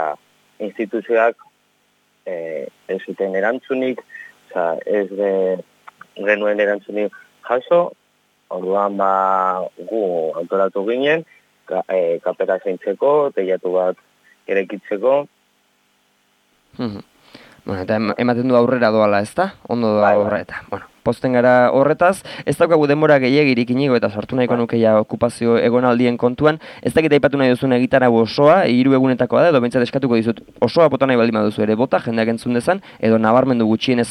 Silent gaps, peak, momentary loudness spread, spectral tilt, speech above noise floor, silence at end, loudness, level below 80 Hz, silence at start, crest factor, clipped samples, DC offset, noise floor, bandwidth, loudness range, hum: none; 0 dBFS; 13 LU; -7 dB/octave; 45 dB; 0 s; -17 LUFS; -56 dBFS; 0 s; 16 dB; under 0.1%; under 0.1%; -62 dBFS; 12.5 kHz; 8 LU; 50 Hz at -50 dBFS